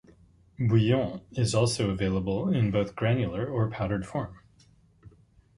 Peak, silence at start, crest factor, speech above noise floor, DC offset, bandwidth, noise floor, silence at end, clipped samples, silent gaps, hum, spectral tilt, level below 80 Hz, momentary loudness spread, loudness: -10 dBFS; 0.6 s; 18 dB; 34 dB; under 0.1%; 11.5 kHz; -60 dBFS; 0.5 s; under 0.1%; none; none; -6.5 dB/octave; -50 dBFS; 7 LU; -28 LUFS